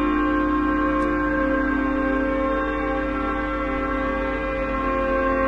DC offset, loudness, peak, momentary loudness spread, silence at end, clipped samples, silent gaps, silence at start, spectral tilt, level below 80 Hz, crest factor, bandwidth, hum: under 0.1%; -23 LUFS; -10 dBFS; 4 LU; 0 s; under 0.1%; none; 0 s; -7.5 dB/octave; -34 dBFS; 12 dB; 7 kHz; none